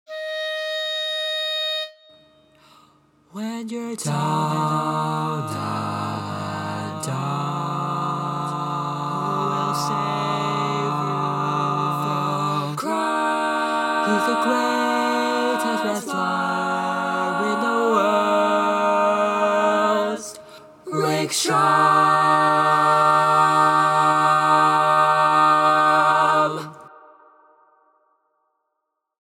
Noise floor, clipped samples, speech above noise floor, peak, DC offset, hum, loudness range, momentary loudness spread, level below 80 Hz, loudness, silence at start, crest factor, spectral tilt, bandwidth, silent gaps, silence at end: -78 dBFS; under 0.1%; 55 dB; -4 dBFS; under 0.1%; none; 10 LU; 11 LU; -72 dBFS; -20 LUFS; 0.1 s; 18 dB; -4.5 dB/octave; 17 kHz; none; 2.35 s